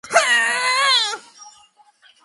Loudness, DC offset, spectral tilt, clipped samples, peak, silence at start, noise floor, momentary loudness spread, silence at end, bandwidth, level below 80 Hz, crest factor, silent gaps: -16 LUFS; under 0.1%; 2 dB/octave; under 0.1%; 0 dBFS; 0.05 s; -54 dBFS; 8 LU; 0.75 s; 11.5 kHz; -76 dBFS; 20 dB; none